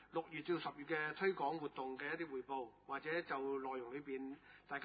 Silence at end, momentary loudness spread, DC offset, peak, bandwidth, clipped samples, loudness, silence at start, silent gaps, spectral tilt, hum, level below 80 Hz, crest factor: 0 s; 9 LU; under 0.1%; -26 dBFS; 4.8 kHz; under 0.1%; -44 LUFS; 0 s; none; -3 dB/octave; none; -80 dBFS; 18 dB